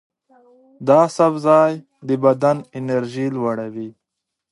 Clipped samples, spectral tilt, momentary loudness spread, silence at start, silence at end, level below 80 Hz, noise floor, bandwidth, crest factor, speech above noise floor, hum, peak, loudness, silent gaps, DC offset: under 0.1%; -7 dB/octave; 15 LU; 0.8 s; 0.6 s; -68 dBFS; -81 dBFS; 11.5 kHz; 18 dB; 63 dB; none; -2 dBFS; -18 LUFS; none; under 0.1%